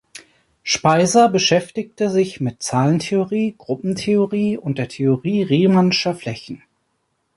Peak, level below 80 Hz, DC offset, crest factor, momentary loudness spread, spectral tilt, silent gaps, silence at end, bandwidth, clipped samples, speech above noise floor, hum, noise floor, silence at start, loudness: -2 dBFS; -58 dBFS; under 0.1%; 16 dB; 13 LU; -5 dB/octave; none; 0.8 s; 11.5 kHz; under 0.1%; 52 dB; none; -69 dBFS; 0.15 s; -18 LUFS